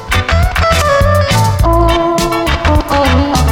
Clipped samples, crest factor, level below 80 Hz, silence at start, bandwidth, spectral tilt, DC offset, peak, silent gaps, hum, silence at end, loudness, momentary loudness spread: under 0.1%; 10 dB; -16 dBFS; 0 s; 17.5 kHz; -5 dB/octave; under 0.1%; 0 dBFS; none; none; 0 s; -11 LUFS; 3 LU